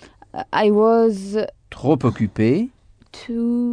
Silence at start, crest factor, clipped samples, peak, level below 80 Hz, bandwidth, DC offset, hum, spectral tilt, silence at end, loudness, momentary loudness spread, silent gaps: 0.35 s; 16 dB; under 0.1%; -4 dBFS; -52 dBFS; 10 kHz; under 0.1%; none; -8 dB/octave; 0 s; -19 LUFS; 15 LU; none